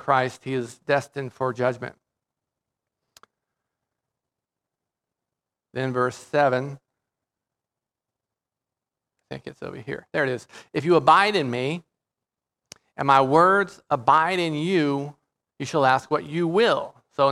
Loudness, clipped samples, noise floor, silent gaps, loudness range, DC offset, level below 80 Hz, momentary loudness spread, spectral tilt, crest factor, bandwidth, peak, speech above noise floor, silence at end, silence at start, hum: -22 LUFS; under 0.1%; -88 dBFS; none; 13 LU; under 0.1%; -70 dBFS; 19 LU; -5.5 dB/octave; 22 dB; 13 kHz; -2 dBFS; 66 dB; 0 s; 0.05 s; none